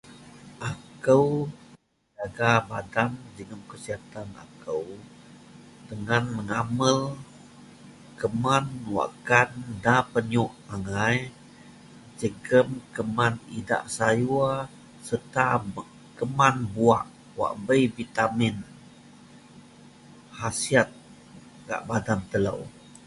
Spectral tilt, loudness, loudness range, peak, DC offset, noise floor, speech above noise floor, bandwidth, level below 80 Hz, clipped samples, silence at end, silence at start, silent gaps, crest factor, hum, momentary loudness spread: -5.5 dB/octave; -26 LUFS; 5 LU; -4 dBFS; under 0.1%; -57 dBFS; 31 dB; 11.5 kHz; -56 dBFS; under 0.1%; 0.1 s; 0.05 s; none; 24 dB; none; 18 LU